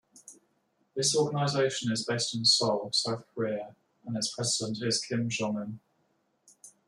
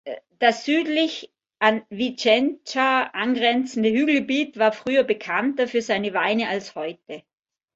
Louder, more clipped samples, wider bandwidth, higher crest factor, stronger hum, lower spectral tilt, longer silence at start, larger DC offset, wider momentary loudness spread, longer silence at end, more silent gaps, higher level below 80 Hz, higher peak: second, -29 LUFS vs -22 LUFS; neither; first, 13.5 kHz vs 8 kHz; about the same, 20 dB vs 20 dB; neither; about the same, -3.5 dB/octave vs -4 dB/octave; about the same, 0.15 s vs 0.05 s; neither; about the same, 14 LU vs 12 LU; second, 0.2 s vs 0.55 s; neither; about the same, -72 dBFS vs -68 dBFS; second, -12 dBFS vs -4 dBFS